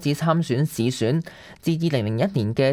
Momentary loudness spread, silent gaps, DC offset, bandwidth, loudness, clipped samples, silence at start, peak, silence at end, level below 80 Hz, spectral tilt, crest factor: 5 LU; none; under 0.1%; 15.5 kHz; -23 LUFS; under 0.1%; 0 s; -6 dBFS; 0 s; -56 dBFS; -6.5 dB/octave; 16 dB